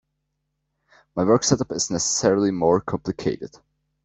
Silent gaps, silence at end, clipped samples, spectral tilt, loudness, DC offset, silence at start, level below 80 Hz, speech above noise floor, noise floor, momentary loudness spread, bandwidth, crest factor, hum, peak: none; 0.55 s; under 0.1%; -4.5 dB/octave; -21 LUFS; under 0.1%; 1.15 s; -54 dBFS; 55 dB; -76 dBFS; 11 LU; 8.4 kHz; 20 dB; none; -4 dBFS